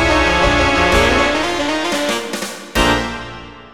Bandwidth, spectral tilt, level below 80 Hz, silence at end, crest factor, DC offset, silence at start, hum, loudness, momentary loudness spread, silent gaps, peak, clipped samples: 18.5 kHz; -4 dB/octave; -28 dBFS; 0 s; 16 dB; 1%; 0 s; none; -15 LUFS; 12 LU; none; 0 dBFS; under 0.1%